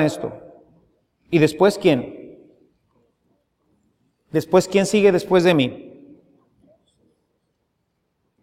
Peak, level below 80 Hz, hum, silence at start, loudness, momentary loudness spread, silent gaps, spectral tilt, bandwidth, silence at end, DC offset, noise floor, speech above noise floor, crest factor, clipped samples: -2 dBFS; -60 dBFS; none; 0 s; -18 LUFS; 19 LU; none; -6 dB/octave; 15.5 kHz; 2.55 s; under 0.1%; -72 dBFS; 55 dB; 20 dB; under 0.1%